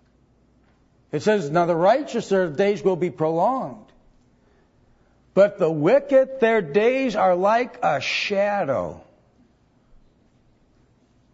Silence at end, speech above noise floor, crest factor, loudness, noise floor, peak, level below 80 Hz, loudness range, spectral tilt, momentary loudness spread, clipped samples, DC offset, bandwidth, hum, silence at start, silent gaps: 2.35 s; 39 dB; 18 dB; -21 LUFS; -59 dBFS; -4 dBFS; -60 dBFS; 6 LU; -6 dB/octave; 7 LU; under 0.1%; under 0.1%; 8 kHz; none; 1.15 s; none